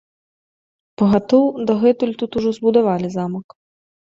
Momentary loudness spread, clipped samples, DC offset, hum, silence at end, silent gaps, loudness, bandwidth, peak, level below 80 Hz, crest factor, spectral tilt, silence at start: 9 LU; under 0.1%; under 0.1%; none; 0.65 s; none; -18 LUFS; 7.6 kHz; -2 dBFS; -56 dBFS; 16 dB; -8 dB/octave; 1 s